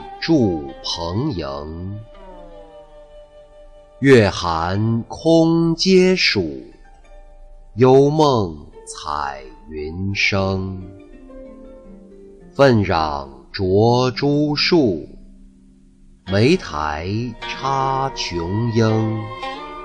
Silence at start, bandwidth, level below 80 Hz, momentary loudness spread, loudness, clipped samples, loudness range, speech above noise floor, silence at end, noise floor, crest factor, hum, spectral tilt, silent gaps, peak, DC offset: 0 s; 10 kHz; -42 dBFS; 18 LU; -18 LUFS; under 0.1%; 8 LU; 31 dB; 0 s; -48 dBFS; 16 dB; none; -6 dB/octave; none; -2 dBFS; under 0.1%